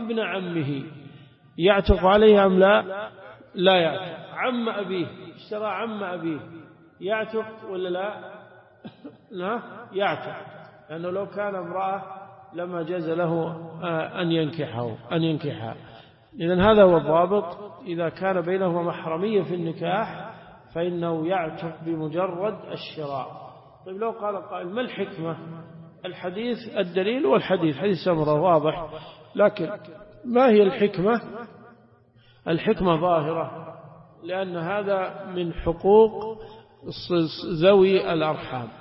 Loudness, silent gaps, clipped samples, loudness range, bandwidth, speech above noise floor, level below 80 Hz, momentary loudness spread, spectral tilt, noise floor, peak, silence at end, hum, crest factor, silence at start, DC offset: -24 LUFS; none; under 0.1%; 11 LU; 5.8 kHz; 33 dB; -44 dBFS; 20 LU; -11 dB/octave; -56 dBFS; -4 dBFS; 0 s; none; 20 dB; 0 s; under 0.1%